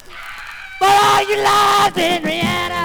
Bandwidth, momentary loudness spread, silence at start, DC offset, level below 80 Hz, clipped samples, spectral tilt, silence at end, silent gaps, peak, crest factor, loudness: over 20 kHz; 18 LU; 0.1 s; under 0.1%; -46 dBFS; under 0.1%; -3 dB/octave; 0 s; none; -2 dBFS; 14 dB; -14 LUFS